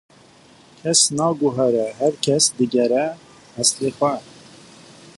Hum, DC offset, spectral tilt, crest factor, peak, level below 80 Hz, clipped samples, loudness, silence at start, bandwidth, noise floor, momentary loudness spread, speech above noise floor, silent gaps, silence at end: none; under 0.1%; -3 dB/octave; 20 dB; 0 dBFS; -64 dBFS; under 0.1%; -19 LUFS; 0.85 s; 11.5 kHz; -50 dBFS; 13 LU; 30 dB; none; 0.05 s